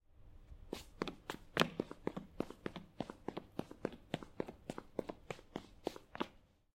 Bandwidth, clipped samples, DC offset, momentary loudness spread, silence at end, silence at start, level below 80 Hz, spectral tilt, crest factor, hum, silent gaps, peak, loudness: 16.5 kHz; under 0.1%; under 0.1%; 12 LU; 0.35 s; 0.1 s; -64 dBFS; -5 dB/octave; 34 dB; none; none; -12 dBFS; -45 LUFS